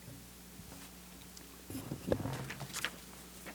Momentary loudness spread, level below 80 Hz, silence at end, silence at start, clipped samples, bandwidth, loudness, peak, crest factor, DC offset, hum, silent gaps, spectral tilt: 14 LU; -58 dBFS; 0 s; 0 s; under 0.1%; over 20 kHz; -43 LUFS; -16 dBFS; 28 dB; under 0.1%; none; none; -4 dB/octave